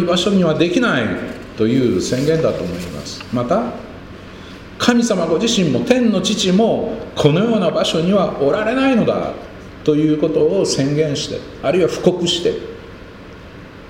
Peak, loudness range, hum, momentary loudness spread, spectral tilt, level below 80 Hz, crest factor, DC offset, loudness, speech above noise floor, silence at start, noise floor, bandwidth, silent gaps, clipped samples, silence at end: 0 dBFS; 4 LU; none; 20 LU; -5 dB/octave; -44 dBFS; 16 dB; under 0.1%; -17 LUFS; 20 dB; 0 s; -36 dBFS; 16.5 kHz; none; under 0.1%; 0 s